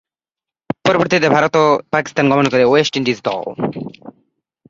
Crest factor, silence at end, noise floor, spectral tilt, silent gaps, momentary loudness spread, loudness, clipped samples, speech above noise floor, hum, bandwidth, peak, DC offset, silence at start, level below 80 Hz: 16 dB; 0.6 s; -88 dBFS; -5.5 dB/octave; none; 11 LU; -15 LUFS; under 0.1%; 73 dB; none; 7.8 kHz; 0 dBFS; under 0.1%; 0.85 s; -56 dBFS